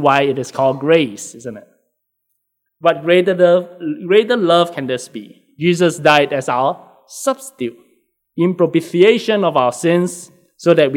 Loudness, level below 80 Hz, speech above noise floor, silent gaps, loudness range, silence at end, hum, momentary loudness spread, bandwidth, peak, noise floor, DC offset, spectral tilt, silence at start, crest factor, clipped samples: -15 LUFS; -68 dBFS; 56 dB; none; 3 LU; 0 s; none; 17 LU; 15.5 kHz; 0 dBFS; -71 dBFS; under 0.1%; -5 dB/octave; 0 s; 16 dB; under 0.1%